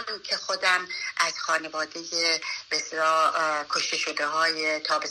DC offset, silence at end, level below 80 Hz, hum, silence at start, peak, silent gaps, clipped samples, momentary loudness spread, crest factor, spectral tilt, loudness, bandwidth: under 0.1%; 0 s; -74 dBFS; none; 0 s; -10 dBFS; none; under 0.1%; 6 LU; 18 dB; 0 dB/octave; -25 LUFS; 13.5 kHz